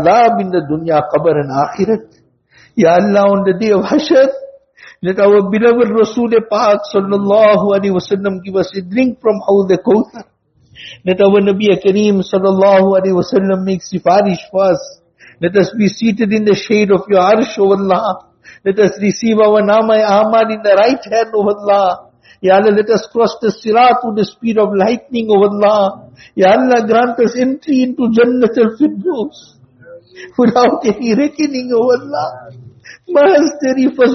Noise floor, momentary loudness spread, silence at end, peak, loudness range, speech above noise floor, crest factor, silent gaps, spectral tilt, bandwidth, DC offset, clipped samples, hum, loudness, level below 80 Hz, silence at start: -48 dBFS; 8 LU; 0 s; 0 dBFS; 3 LU; 37 dB; 12 dB; none; -5 dB/octave; 6.4 kHz; under 0.1%; under 0.1%; none; -12 LUFS; -54 dBFS; 0 s